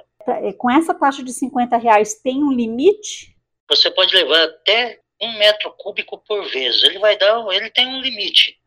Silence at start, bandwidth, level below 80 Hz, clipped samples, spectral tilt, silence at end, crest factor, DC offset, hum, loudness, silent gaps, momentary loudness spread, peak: 0.25 s; 15.5 kHz; -64 dBFS; under 0.1%; -1.5 dB/octave; 0.15 s; 16 dB; under 0.1%; none; -16 LUFS; 3.60-3.67 s; 12 LU; 0 dBFS